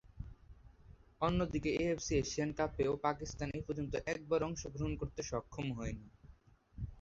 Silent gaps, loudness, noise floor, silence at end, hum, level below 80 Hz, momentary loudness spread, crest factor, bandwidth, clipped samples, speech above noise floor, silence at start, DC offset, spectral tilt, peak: none; -38 LUFS; -63 dBFS; 0 s; none; -52 dBFS; 12 LU; 20 dB; 7.6 kHz; under 0.1%; 25 dB; 0.05 s; under 0.1%; -5.5 dB/octave; -18 dBFS